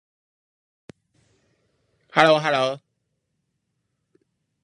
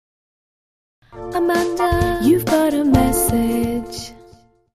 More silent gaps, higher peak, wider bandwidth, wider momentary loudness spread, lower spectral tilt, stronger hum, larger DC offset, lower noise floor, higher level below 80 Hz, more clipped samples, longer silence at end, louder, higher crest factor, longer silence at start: neither; about the same, 0 dBFS vs -2 dBFS; second, 11.5 kHz vs 15.5 kHz; second, 11 LU vs 15 LU; about the same, -4.5 dB/octave vs -5.5 dB/octave; neither; neither; first, -76 dBFS vs -49 dBFS; second, -72 dBFS vs -34 dBFS; neither; first, 1.85 s vs 0.6 s; about the same, -19 LUFS vs -18 LUFS; first, 26 dB vs 18 dB; first, 2.15 s vs 1.15 s